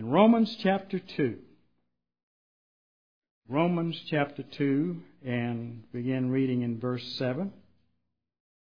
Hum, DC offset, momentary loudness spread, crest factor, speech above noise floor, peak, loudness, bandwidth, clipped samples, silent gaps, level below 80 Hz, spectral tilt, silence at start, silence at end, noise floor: 60 Hz at -55 dBFS; 0.1%; 11 LU; 22 dB; 52 dB; -8 dBFS; -29 LUFS; 5.2 kHz; under 0.1%; 2.23-3.22 s, 3.31-3.42 s; -72 dBFS; -8.5 dB/octave; 0 s; 1.25 s; -80 dBFS